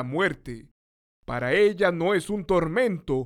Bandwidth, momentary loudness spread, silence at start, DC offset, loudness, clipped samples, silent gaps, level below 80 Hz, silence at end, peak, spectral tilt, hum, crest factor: 13 kHz; 15 LU; 0 s; under 0.1%; -24 LUFS; under 0.1%; 0.71-1.23 s; -48 dBFS; 0 s; -10 dBFS; -6 dB/octave; none; 16 dB